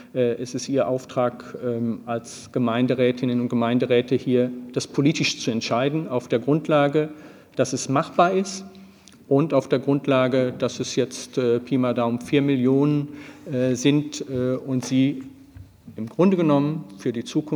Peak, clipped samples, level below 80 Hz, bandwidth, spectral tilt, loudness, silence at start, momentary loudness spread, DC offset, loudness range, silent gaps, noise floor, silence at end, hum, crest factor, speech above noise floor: -4 dBFS; under 0.1%; -64 dBFS; 12 kHz; -6 dB/octave; -23 LUFS; 0 s; 10 LU; under 0.1%; 2 LU; none; -48 dBFS; 0 s; none; 18 dB; 26 dB